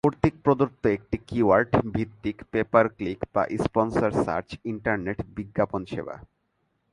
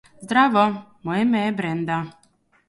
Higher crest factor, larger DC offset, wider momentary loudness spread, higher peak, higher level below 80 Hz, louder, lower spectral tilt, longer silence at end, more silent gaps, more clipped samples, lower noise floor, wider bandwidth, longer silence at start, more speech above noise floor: about the same, 22 dB vs 18 dB; neither; about the same, 12 LU vs 10 LU; about the same, -2 dBFS vs -4 dBFS; first, -48 dBFS vs -62 dBFS; second, -26 LUFS vs -21 LUFS; first, -8 dB/octave vs -6.5 dB/octave; about the same, 0.7 s vs 0.6 s; neither; neither; first, -73 dBFS vs -61 dBFS; about the same, 11.5 kHz vs 11.5 kHz; second, 0.05 s vs 0.2 s; first, 48 dB vs 41 dB